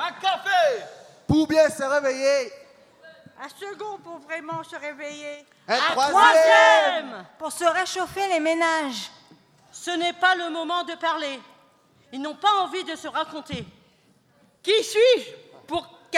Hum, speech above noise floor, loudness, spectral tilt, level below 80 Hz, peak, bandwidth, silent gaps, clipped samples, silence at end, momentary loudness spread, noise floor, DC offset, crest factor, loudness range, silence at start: none; 38 dB; -21 LUFS; -3 dB/octave; -60 dBFS; -4 dBFS; 15 kHz; none; under 0.1%; 0 s; 21 LU; -61 dBFS; under 0.1%; 20 dB; 10 LU; 0 s